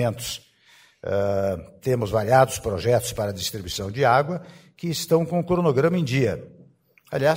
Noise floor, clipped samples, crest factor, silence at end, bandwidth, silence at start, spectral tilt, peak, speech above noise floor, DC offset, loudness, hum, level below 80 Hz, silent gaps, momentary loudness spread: -56 dBFS; under 0.1%; 20 dB; 0 s; 16 kHz; 0 s; -5.5 dB/octave; -2 dBFS; 33 dB; under 0.1%; -23 LUFS; none; -50 dBFS; none; 12 LU